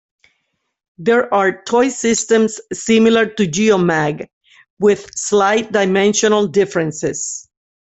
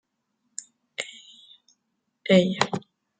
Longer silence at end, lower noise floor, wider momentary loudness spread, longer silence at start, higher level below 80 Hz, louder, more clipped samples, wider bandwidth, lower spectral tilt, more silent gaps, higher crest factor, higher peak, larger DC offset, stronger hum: about the same, 0.5 s vs 0.4 s; second, -70 dBFS vs -77 dBFS; second, 9 LU vs 20 LU; about the same, 1 s vs 1 s; first, -56 dBFS vs -70 dBFS; first, -15 LUFS vs -24 LUFS; neither; second, 8.4 kHz vs 9.4 kHz; about the same, -4 dB/octave vs -5 dB/octave; first, 4.33-4.41 s, 4.70-4.77 s vs none; second, 14 dB vs 26 dB; about the same, -2 dBFS vs -2 dBFS; neither; neither